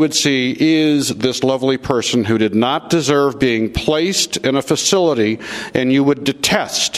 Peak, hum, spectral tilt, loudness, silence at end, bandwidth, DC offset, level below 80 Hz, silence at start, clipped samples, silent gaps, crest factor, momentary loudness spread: 0 dBFS; none; -4 dB/octave; -16 LUFS; 0 s; 15.5 kHz; under 0.1%; -42 dBFS; 0 s; under 0.1%; none; 16 dB; 4 LU